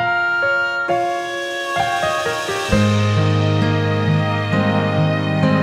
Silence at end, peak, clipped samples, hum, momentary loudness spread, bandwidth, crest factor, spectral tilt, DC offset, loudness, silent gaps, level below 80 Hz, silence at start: 0 s; -2 dBFS; under 0.1%; none; 5 LU; 14 kHz; 14 dB; -6 dB/octave; under 0.1%; -18 LUFS; none; -42 dBFS; 0 s